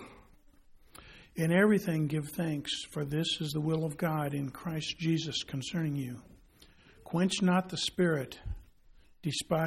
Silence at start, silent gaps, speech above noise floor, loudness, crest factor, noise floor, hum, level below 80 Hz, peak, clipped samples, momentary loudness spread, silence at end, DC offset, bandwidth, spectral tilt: 0 s; none; 28 dB; -32 LUFS; 20 dB; -60 dBFS; none; -56 dBFS; -12 dBFS; under 0.1%; 16 LU; 0 s; under 0.1%; 16 kHz; -5.5 dB/octave